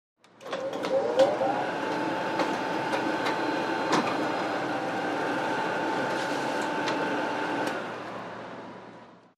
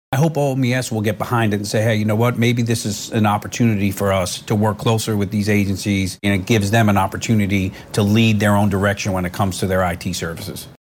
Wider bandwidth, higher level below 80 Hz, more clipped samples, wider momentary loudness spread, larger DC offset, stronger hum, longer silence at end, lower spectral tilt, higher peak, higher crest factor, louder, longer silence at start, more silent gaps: second, 14.5 kHz vs 17 kHz; second, -72 dBFS vs -48 dBFS; neither; first, 12 LU vs 6 LU; neither; neither; about the same, 0.2 s vs 0.1 s; about the same, -4.5 dB/octave vs -5.5 dB/octave; second, -10 dBFS vs -4 dBFS; first, 20 dB vs 14 dB; second, -29 LUFS vs -18 LUFS; first, 0.4 s vs 0.1 s; neither